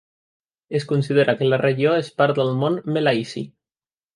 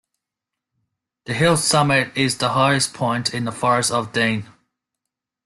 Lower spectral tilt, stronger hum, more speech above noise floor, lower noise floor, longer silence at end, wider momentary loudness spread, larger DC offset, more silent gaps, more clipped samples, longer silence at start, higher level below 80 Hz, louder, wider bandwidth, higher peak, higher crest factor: first, -7 dB/octave vs -4 dB/octave; neither; first, over 70 dB vs 65 dB; first, under -90 dBFS vs -84 dBFS; second, 0.7 s vs 1 s; first, 9 LU vs 6 LU; neither; neither; neither; second, 0.7 s vs 1.25 s; second, -66 dBFS vs -56 dBFS; about the same, -20 LUFS vs -19 LUFS; about the same, 11.5 kHz vs 12.5 kHz; about the same, -4 dBFS vs -4 dBFS; about the same, 18 dB vs 18 dB